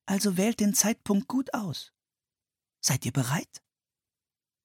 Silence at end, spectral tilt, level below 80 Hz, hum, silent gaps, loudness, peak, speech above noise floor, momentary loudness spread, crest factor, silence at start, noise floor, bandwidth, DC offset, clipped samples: 1.05 s; -4 dB/octave; -66 dBFS; none; none; -27 LUFS; -8 dBFS; over 63 dB; 10 LU; 22 dB; 0.05 s; under -90 dBFS; 17.5 kHz; under 0.1%; under 0.1%